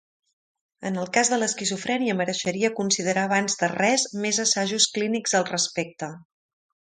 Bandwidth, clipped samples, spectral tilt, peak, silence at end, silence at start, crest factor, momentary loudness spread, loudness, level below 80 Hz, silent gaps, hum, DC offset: 10 kHz; under 0.1%; -2.5 dB/octave; -2 dBFS; 0.65 s; 0.8 s; 22 dB; 9 LU; -23 LUFS; -70 dBFS; none; none; under 0.1%